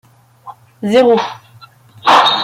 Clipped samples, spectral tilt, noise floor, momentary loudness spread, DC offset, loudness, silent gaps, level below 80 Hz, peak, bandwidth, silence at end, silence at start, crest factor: under 0.1%; -4 dB/octave; -43 dBFS; 14 LU; under 0.1%; -12 LUFS; none; -60 dBFS; 0 dBFS; 15.5 kHz; 0 s; 0.45 s; 14 dB